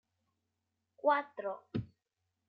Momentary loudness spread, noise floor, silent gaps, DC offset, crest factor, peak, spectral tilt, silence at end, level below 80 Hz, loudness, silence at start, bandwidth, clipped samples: 11 LU; -86 dBFS; none; under 0.1%; 22 dB; -18 dBFS; -8.5 dB/octave; 0.65 s; -70 dBFS; -36 LUFS; 1.05 s; 5.4 kHz; under 0.1%